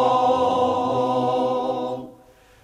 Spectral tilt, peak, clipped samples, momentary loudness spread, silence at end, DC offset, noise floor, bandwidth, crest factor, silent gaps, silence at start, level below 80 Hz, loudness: -6.5 dB/octave; -8 dBFS; under 0.1%; 9 LU; 0.55 s; under 0.1%; -51 dBFS; 9.8 kHz; 14 dB; none; 0 s; -58 dBFS; -21 LUFS